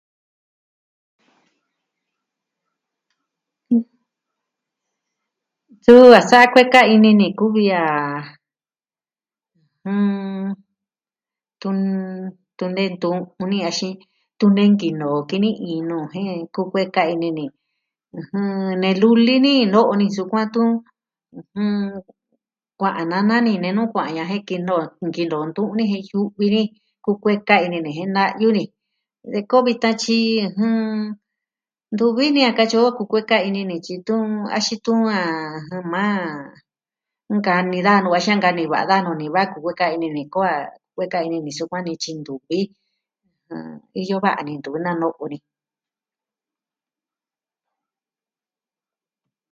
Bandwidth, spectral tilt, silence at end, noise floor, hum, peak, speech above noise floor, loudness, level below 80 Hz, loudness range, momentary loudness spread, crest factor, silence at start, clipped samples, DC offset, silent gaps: 8.6 kHz; -5.5 dB/octave; 4.15 s; under -90 dBFS; none; 0 dBFS; over 72 dB; -18 LUFS; -66 dBFS; 14 LU; 15 LU; 20 dB; 3.7 s; 0.1%; under 0.1%; none